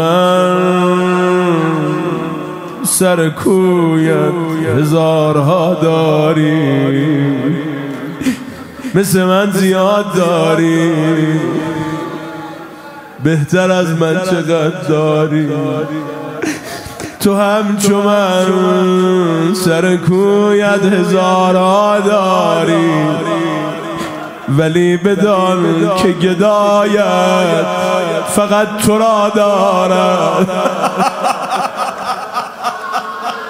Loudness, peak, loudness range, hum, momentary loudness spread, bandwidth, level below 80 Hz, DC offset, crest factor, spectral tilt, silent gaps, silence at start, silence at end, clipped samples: -13 LUFS; 0 dBFS; 4 LU; none; 10 LU; 16 kHz; -52 dBFS; under 0.1%; 12 dB; -5.5 dB/octave; none; 0 s; 0 s; under 0.1%